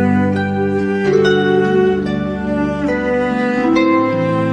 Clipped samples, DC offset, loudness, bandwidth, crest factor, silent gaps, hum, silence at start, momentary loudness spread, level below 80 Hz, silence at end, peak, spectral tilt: under 0.1%; under 0.1%; -15 LUFS; 9.6 kHz; 12 dB; none; none; 0 s; 5 LU; -40 dBFS; 0 s; -2 dBFS; -7.5 dB/octave